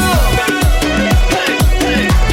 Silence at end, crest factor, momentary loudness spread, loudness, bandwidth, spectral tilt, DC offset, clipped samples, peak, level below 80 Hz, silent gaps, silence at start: 0 s; 10 dB; 1 LU; -13 LUFS; 17 kHz; -4.5 dB/octave; under 0.1%; under 0.1%; -2 dBFS; -14 dBFS; none; 0 s